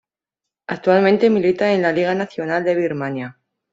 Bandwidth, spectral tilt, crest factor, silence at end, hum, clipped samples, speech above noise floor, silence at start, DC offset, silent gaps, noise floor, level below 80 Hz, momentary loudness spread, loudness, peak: 7.8 kHz; -7 dB/octave; 16 dB; 0.4 s; none; under 0.1%; 67 dB; 0.7 s; under 0.1%; none; -84 dBFS; -62 dBFS; 15 LU; -18 LUFS; -2 dBFS